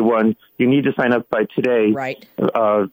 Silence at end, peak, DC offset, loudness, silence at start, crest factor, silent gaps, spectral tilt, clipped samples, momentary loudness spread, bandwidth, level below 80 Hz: 0.05 s; -4 dBFS; under 0.1%; -18 LUFS; 0 s; 12 dB; none; -8.5 dB/octave; under 0.1%; 5 LU; 16 kHz; -62 dBFS